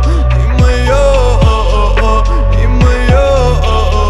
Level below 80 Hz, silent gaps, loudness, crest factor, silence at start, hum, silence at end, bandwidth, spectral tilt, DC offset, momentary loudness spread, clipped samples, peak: -10 dBFS; none; -10 LUFS; 8 dB; 0 s; none; 0 s; 10.5 kHz; -6.5 dB/octave; under 0.1%; 3 LU; under 0.1%; 0 dBFS